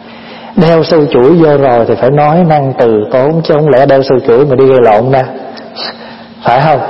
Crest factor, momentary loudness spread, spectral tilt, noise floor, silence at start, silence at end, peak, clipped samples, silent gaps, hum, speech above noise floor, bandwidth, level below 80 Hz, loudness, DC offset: 8 dB; 15 LU; -9.5 dB/octave; -28 dBFS; 0 s; 0 s; 0 dBFS; 0.9%; none; none; 21 dB; 5.8 kHz; -40 dBFS; -7 LUFS; under 0.1%